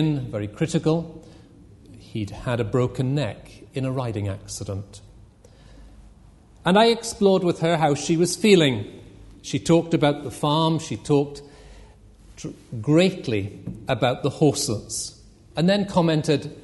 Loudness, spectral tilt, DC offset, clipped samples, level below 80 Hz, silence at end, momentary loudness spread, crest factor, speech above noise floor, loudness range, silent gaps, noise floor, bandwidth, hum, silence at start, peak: -22 LUFS; -5.5 dB/octave; under 0.1%; under 0.1%; -50 dBFS; 0.05 s; 16 LU; 20 dB; 28 dB; 8 LU; none; -50 dBFS; 11.5 kHz; none; 0 s; -4 dBFS